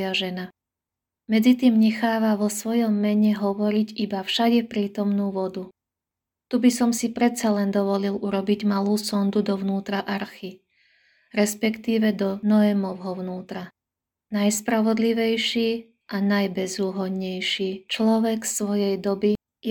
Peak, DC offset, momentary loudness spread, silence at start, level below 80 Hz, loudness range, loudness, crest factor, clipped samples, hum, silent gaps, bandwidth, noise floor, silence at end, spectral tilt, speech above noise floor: -8 dBFS; under 0.1%; 11 LU; 0 s; -66 dBFS; 4 LU; -23 LUFS; 16 dB; under 0.1%; none; none; 18.5 kHz; -87 dBFS; 0 s; -5 dB/octave; 65 dB